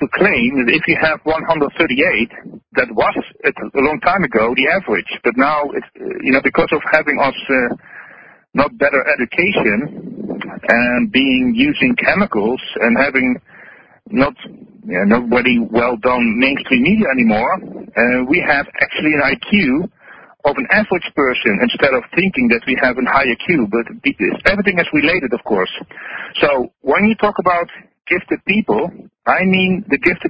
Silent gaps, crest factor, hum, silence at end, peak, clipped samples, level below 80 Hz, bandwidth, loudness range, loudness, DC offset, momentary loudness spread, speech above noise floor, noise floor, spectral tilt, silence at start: none; 16 dB; none; 0 s; 0 dBFS; under 0.1%; -44 dBFS; 5.2 kHz; 2 LU; -15 LUFS; under 0.1%; 9 LU; 27 dB; -42 dBFS; -8 dB/octave; 0 s